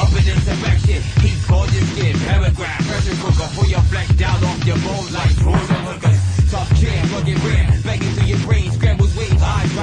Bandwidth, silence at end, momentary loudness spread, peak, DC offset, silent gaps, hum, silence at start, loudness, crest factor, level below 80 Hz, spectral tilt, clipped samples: 10 kHz; 0 s; 3 LU; -4 dBFS; under 0.1%; none; none; 0 s; -17 LUFS; 12 dB; -20 dBFS; -6 dB/octave; under 0.1%